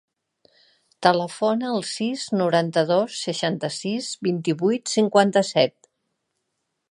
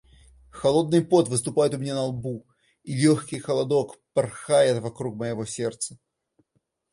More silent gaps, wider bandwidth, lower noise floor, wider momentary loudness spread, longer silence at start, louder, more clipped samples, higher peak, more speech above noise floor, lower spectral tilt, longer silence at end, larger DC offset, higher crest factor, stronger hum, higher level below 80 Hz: neither; about the same, 11.5 kHz vs 11.5 kHz; about the same, -77 dBFS vs -74 dBFS; second, 8 LU vs 13 LU; first, 1 s vs 0.55 s; about the same, -22 LUFS vs -24 LUFS; neither; first, -2 dBFS vs -6 dBFS; first, 56 dB vs 50 dB; about the same, -4.5 dB/octave vs -5.5 dB/octave; first, 1.2 s vs 0.95 s; neither; about the same, 22 dB vs 18 dB; neither; second, -74 dBFS vs -60 dBFS